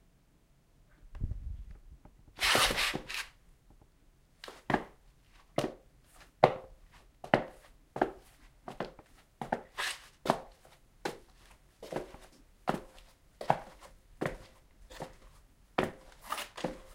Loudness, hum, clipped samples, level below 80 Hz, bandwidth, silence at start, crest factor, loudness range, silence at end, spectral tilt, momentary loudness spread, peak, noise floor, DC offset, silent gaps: -35 LUFS; none; under 0.1%; -52 dBFS; 16 kHz; 1.05 s; 34 dB; 7 LU; 0 s; -3.5 dB/octave; 25 LU; -4 dBFS; -66 dBFS; under 0.1%; none